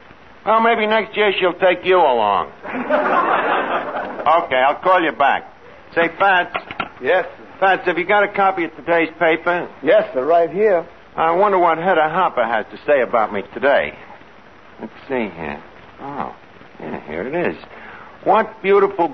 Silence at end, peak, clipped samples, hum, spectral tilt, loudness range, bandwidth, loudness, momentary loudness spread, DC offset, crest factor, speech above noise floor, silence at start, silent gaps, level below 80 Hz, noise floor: 0 s; -4 dBFS; under 0.1%; none; -7 dB/octave; 9 LU; 6.2 kHz; -17 LUFS; 15 LU; 0.4%; 14 dB; 27 dB; 0.45 s; none; -56 dBFS; -44 dBFS